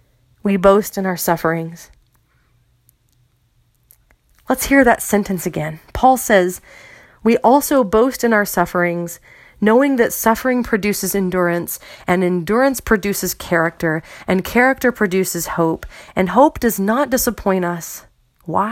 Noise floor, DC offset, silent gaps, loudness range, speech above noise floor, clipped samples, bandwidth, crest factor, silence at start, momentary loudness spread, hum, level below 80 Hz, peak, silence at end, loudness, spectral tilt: -59 dBFS; under 0.1%; none; 4 LU; 43 dB; under 0.1%; 17 kHz; 18 dB; 0.45 s; 12 LU; none; -42 dBFS; 0 dBFS; 0 s; -17 LUFS; -5 dB/octave